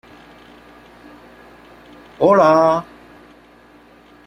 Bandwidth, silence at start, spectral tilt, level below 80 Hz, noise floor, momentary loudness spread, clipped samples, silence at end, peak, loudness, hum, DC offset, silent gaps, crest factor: 11.5 kHz; 2.2 s; -7 dB/octave; -56 dBFS; -47 dBFS; 13 LU; under 0.1%; 1.45 s; -2 dBFS; -14 LUFS; 60 Hz at -55 dBFS; under 0.1%; none; 18 dB